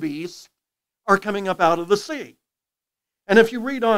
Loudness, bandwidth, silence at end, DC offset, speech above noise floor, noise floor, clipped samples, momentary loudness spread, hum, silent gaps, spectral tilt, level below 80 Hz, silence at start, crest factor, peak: -20 LUFS; 16 kHz; 0 s; under 0.1%; 68 dB; -88 dBFS; under 0.1%; 17 LU; none; none; -5 dB/octave; -64 dBFS; 0 s; 22 dB; 0 dBFS